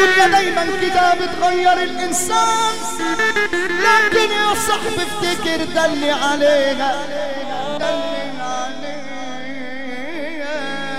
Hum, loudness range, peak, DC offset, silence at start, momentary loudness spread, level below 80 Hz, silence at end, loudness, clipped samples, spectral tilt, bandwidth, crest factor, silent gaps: none; 9 LU; -2 dBFS; 4%; 0 s; 14 LU; -50 dBFS; 0 s; -17 LUFS; under 0.1%; -2 dB/octave; 16 kHz; 16 dB; none